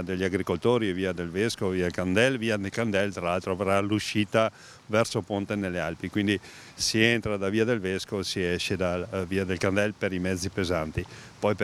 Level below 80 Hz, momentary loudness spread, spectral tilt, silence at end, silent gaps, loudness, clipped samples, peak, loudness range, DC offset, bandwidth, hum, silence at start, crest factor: -56 dBFS; 7 LU; -5 dB/octave; 0 s; none; -27 LUFS; under 0.1%; -4 dBFS; 2 LU; under 0.1%; 15 kHz; none; 0 s; 22 dB